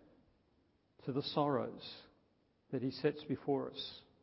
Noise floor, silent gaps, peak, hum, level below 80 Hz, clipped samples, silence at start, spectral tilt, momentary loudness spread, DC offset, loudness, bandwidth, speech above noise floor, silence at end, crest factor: -75 dBFS; none; -20 dBFS; none; -76 dBFS; under 0.1%; 1.05 s; -5 dB/octave; 14 LU; under 0.1%; -39 LUFS; 5.8 kHz; 37 dB; 0.25 s; 22 dB